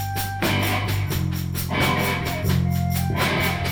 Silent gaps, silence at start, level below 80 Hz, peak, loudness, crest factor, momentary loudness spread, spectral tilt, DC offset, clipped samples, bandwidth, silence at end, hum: none; 0 s; -40 dBFS; -8 dBFS; -23 LUFS; 14 dB; 4 LU; -5 dB/octave; under 0.1%; under 0.1%; over 20 kHz; 0 s; none